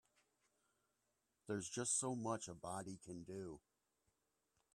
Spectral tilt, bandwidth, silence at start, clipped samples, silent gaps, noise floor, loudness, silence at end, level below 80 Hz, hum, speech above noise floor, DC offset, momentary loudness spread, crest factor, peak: -3.5 dB/octave; 13 kHz; 1.45 s; under 0.1%; none; -87 dBFS; -45 LUFS; 1.15 s; -80 dBFS; none; 41 dB; under 0.1%; 15 LU; 22 dB; -28 dBFS